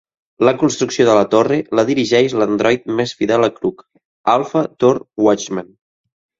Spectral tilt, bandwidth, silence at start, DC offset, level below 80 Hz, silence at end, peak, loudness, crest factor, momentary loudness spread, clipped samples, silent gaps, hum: -5 dB/octave; 7.8 kHz; 0.4 s; under 0.1%; -56 dBFS; 0.75 s; 0 dBFS; -16 LUFS; 16 dB; 7 LU; under 0.1%; 4.05-4.24 s; none